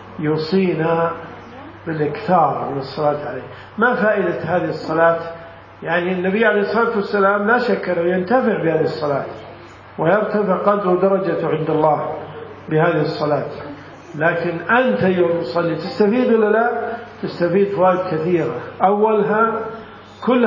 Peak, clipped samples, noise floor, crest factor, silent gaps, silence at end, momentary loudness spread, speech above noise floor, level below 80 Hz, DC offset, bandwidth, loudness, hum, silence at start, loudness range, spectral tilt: 0 dBFS; under 0.1%; -38 dBFS; 18 dB; none; 0 s; 16 LU; 21 dB; -56 dBFS; under 0.1%; 7.4 kHz; -18 LUFS; none; 0 s; 2 LU; -8.5 dB/octave